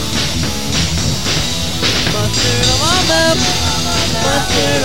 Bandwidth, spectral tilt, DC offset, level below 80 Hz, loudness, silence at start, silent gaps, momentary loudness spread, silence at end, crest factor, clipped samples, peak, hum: 17 kHz; -3 dB/octave; 6%; -28 dBFS; -13 LUFS; 0 s; none; 5 LU; 0 s; 16 dB; under 0.1%; 0 dBFS; none